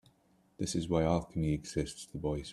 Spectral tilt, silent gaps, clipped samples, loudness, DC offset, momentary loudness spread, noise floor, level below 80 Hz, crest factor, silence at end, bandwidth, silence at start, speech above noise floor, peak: -6 dB/octave; none; under 0.1%; -34 LUFS; under 0.1%; 9 LU; -69 dBFS; -50 dBFS; 20 dB; 0 s; 12.5 kHz; 0.6 s; 36 dB; -16 dBFS